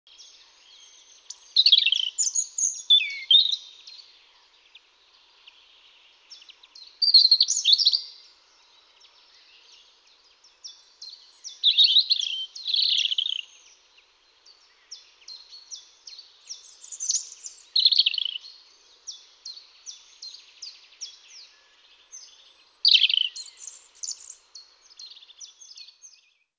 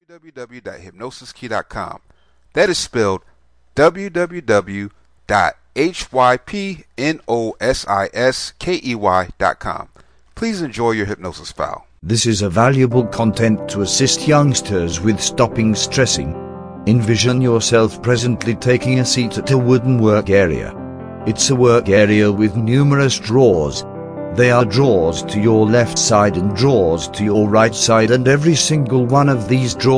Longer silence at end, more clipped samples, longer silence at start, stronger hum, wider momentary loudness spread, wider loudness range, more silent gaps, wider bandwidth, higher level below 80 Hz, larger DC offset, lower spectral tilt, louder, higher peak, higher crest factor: first, 1.15 s vs 0 s; neither; first, 1.55 s vs 0.15 s; neither; first, 27 LU vs 14 LU; first, 20 LU vs 6 LU; neither; second, 8 kHz vs 10.5 kHz; second, -84 dBFS vs -42 dBFS; neither; second, 7.5 dB/octave vs -5 dB/octave; second, -19 LUFS vs -15 LUFS; second, -6 dBFS vs 0 dBFS; first, 22 dB vs 16 dB